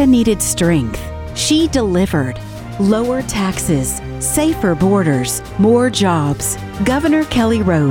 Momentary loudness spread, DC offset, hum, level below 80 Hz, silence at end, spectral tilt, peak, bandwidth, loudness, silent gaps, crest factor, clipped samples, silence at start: 7 LU; under 0.1%; none; -34 dBFS; 0 s; -5 dB/octave; -2 dBFS; 17.5 kHz; -15 LUFS; none; 14 dB; under 0.1%; 0 s